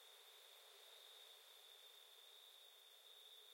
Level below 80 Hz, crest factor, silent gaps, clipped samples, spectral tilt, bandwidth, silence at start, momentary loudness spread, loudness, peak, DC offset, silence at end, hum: under -90 dBFS; 14 dB; none; under 0.1%; 3.5 dB/octave; 16.5 kHz; 0 s; 2 LU; -62 LUFS; -50 dBFS; under 0.1%; 0 s; none